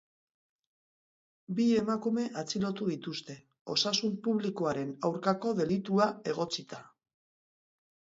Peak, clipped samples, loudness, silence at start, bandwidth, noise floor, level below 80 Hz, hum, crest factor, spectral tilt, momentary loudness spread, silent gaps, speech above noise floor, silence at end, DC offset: -12 dBFS; under 0.1%; -31 LUFS; 1.5 s; 7.8 kHz; under -90 dBFS; -72 dBFS; none; 20 dB; -5 dB/octave; 11 LU; 3.61-3.65 s; over 59 dB; 1.3 s; under 0.1%